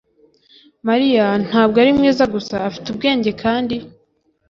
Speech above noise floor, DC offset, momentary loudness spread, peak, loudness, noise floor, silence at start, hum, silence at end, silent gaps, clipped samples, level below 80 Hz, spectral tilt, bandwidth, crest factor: 46 dB; under 0.1%; 11 LU; -2 dBFS; -17 LUFS; -62 dBFS; 0.85 s; none; 0.6 s; none; under 0.1%; -50 dBFS; -6 dB/octave; 7.4 kHz; 16 dB